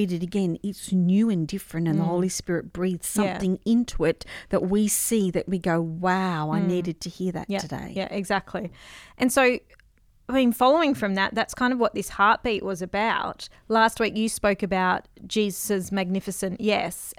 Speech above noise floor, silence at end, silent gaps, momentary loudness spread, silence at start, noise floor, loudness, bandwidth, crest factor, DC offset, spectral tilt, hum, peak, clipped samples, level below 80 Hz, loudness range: 34 dB; 0.05 s; none; 9 LU; 0 s; -58 dBFS; -25 LUFS; 17 kHz; 18 dB; under 0.1%; -5 dB/octave; none; -6 dBFS; under 0.1%; -50 dBFS; 4 LU